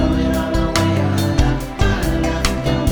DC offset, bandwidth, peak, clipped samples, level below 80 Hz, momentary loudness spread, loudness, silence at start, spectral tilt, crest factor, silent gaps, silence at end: under 0.1%; over 20 kHz; 0 dBFS; under 0.1%; -22 dBFS; 2 LU; -18 LUFS; 0 s; -5.5 dB/octave; 16 dB; none; 0 s